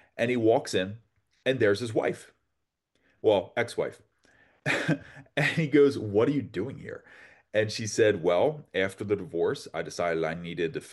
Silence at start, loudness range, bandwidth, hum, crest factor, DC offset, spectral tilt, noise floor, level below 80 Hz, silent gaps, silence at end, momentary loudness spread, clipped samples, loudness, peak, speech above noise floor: 0.15 s; 4 LU; 12 kHz; none; 18 dB; under 0.1%; -5.5 dB/octave; -81 dBFS; -68 dBFS; none; 0 s; 12 LU; under 0.1%; -28 LUFS; -10 dBFS; 54 dB